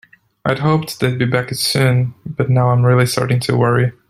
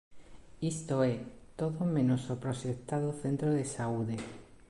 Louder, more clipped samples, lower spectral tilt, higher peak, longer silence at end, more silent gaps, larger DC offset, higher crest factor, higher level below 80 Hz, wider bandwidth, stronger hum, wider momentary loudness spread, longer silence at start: first, -16 LUFS vs -34 LUFS; neither; about the same, -6 dB/octave vs -7 dB/octave; first, 0 dBFS vs -18 dBFS; about the same, 0.2 s vs 0.15 s; neither; neither; about the same, 14 dB vs 16 dB; first, -50 dBFS vs -60 dBFS; first, 14 kHz vs 11.5 kHz; neither; about the same, 7 LU vs 8 LU; first, 0.45 s vs 0.1 s